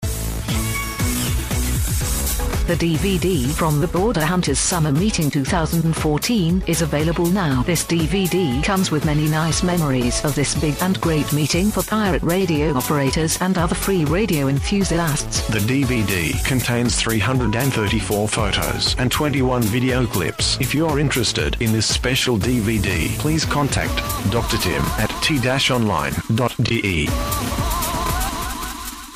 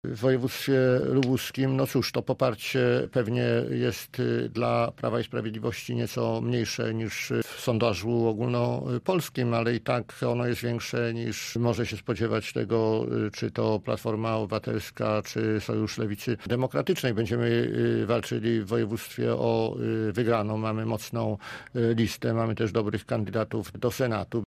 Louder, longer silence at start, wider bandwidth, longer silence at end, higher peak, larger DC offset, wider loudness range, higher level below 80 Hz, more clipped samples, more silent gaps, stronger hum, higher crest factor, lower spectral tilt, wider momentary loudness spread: first, -19 LUFS vs -28 LUFS; about the same, 0 s vs 0.05 s; about the same, 15.5 kHz vs 15.5 kHz; about the same, 0 s vs 0 s; first, -6 dBFS vs -10 dBFS; neither; about the same, 1 LU vs 2 LU; first, -30 dBFS vs -58 dBFS; neither; neither; neither; second, 12 dB vs 18 dB; second, -4.5 dB/octave vs -6.5 dB/octave; about the same, 4 LU vs 5 LU